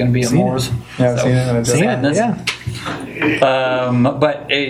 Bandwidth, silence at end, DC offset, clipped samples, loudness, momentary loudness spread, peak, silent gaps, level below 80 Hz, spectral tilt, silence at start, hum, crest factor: 14.5 kHz; 0 s; under 0.1%; under 0.1%; -16 LUFS; 8 LU; 0 dBFS; none; -44 dBFS; -5.5 dB/octave; 0 s; none; 16 dB